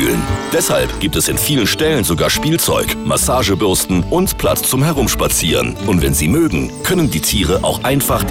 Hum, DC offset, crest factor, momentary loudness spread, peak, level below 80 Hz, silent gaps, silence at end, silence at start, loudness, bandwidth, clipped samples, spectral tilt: none; under 0.1%; 8 dB; 3 LU; -6 dBFS; -28 dBFS; none; 0 s; 0 s; -14 LUFS; 17.5 kHz; under 0.1%; -4 dB/octave